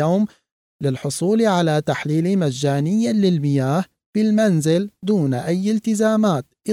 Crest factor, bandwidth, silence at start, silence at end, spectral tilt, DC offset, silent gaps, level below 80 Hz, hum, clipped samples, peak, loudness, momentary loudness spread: 12 dB; 14.5 kHz; 0 s; 0 s; -6.5 dB/octave; under 0.1%; 0.52-0.79 s, 4.06-4.13 s; -62 dBFS; none; under 0.1%; -6 dBFS; -19 LUFS; 7 LU